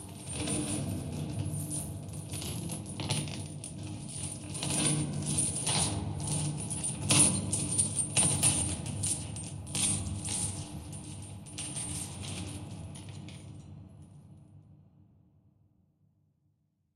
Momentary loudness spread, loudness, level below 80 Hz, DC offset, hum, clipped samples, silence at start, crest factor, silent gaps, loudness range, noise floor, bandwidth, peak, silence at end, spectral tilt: 18 LU; -31 LUFS; -54 dBFS; under 0.1%; none; under 0.1%; 0 s; 24 dB; none; 15 LU; -74 dBFS; 16 kHz; -10 dBFS; 2.15 s; -3 dB/octave